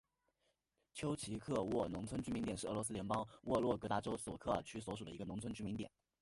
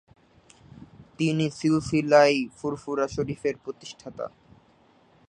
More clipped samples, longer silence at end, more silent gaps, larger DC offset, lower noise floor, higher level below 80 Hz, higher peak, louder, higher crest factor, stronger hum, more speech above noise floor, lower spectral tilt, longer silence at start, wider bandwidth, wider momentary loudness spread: neither; second, 0.35 s vs 1 s; neither; neither; first, -84 dBFS vs -60 dBFS; second, -64 dBFS vs -58 dBFS; second, -22 dBFS vs -4 dBFS; second, -42 LUFS vs -25 LUFS; about the same, 20 dB vs 22 dB; neither; first, 42 dB vs 35 dB; about the same, -5.5 dB/octave vs -6 dB/octave; about the same, 0.95 s vs 1 s; first, 11.5 kHz vs 10 kHz; second, 9 LU vs 20 LU